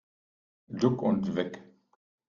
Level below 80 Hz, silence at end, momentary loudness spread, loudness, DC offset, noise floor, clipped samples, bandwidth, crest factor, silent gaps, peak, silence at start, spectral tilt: -68 dBFS; 0.65 s; 16 LU; -29 LUFS; under 0.1%; under -90 dBFS; under 0.1%; 7.4 kHz; 22 dB; none; -10 dBFS; 0.7 s; -7.5 dB/octave